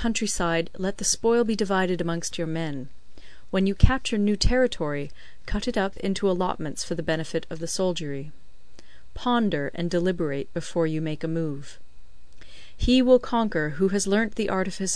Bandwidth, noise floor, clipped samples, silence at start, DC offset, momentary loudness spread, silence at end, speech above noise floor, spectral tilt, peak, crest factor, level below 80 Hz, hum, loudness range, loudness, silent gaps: 11 kHz; -50 dBFS; under 0.1%; 0 s; 2%; 10 LU; 0 s; 25 dB; -4.5 dB/octave; -2 dBFS; 24 dB; -36 dBFS; none; 4 LU; -25 LUFS; none